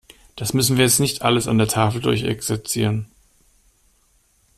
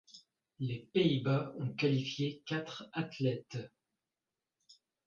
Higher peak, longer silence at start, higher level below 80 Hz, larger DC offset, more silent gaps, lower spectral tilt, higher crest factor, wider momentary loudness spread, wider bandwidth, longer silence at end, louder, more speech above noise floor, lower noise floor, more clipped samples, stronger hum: first, -4 dBFS vs -18 dBFS; first, 0.35 s vs 0.15 s; first, -48 dBFS vs -74 dBFS; neither; neither; second, -4 dB/octave vs -7 dB/octave; about the same, 18 dB vs 18 dB; about the same, 9 LU vs 11 LU; first, 15.5 kHz vs 7.2 kHz; first, 1.55 s vs 0.35 s; first, -19 LUFS vs -36 LUFS; second, 41 dB vs over 55 dB; second, -61 dBFS vs under -90 dBFS; neither; neither